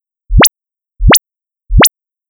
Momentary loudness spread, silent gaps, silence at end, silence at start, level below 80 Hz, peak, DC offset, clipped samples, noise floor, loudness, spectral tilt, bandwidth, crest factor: 8 LU; none; 0.4 s; 0.3 s; -16 dBFS; 0 dBFS; under 0.1%; under 0.1%; -84 dBFS; -9 LUFS; -3 dB/octave; over 20 kHz; 10 dB